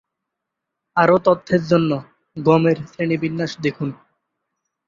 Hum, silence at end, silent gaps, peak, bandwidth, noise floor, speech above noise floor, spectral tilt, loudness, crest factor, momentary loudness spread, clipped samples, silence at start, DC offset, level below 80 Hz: none; 0.95 s; none; -2 dBFS; 7.4 kHz; -81 dBFS; 63 dB; -7.5 dB/octave; -19 LUFS; 20 dB; 11 LU; under 0.1%; 0.95 s; under 0.1%; -58 dBFS